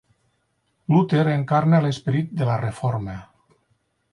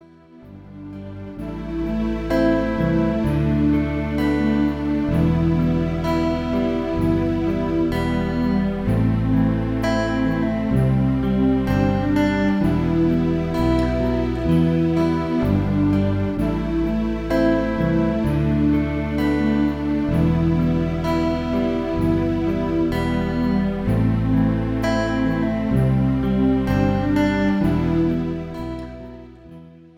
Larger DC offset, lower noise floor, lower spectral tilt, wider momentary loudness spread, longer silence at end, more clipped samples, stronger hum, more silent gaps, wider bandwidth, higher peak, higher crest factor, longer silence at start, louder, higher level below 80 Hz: neither; first, -70 dBFS vs -45 dBFS; about the same, -8 dB/octave vs -8.5 dB/octave; first, 14 LU vs 4 LU; first, 0.9 s vs 0.2 s; neither; neither; neither; second, 10.5 kHz vs 15.5 kHz; about the same, -6 dBFS vs -6 dBFS; about the same, 16 dB vs 14 dB; first, 0.9 s vs 0.35 s; about the same, -21 LUFS vs -20 LUFS; second, -54 dBFS vs -32 dBFS